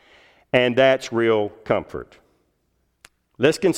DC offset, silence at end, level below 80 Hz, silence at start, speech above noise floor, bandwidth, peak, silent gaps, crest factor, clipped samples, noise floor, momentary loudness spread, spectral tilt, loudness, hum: under 0.1%; 0 s; -56 dBFS; 0.55 s; 49 dB; 15 kHz; -2 dBFS; none; 20 dB; under 0.1%; -69 dBFS; 8 LU; -5 dB/octave; -20 LUFS; none